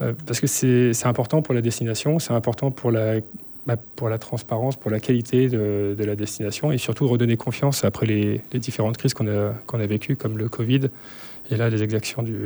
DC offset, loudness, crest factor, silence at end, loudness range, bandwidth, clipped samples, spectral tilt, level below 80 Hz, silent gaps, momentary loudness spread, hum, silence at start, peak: under 0.1%; -23 LUFS; 16 dB; 0 s; 3 LU; over 20 kHz; under 0.1%; -6 dB/octave; -60 dBFS; none; 8 LU; none; 0 s; -6 dBFS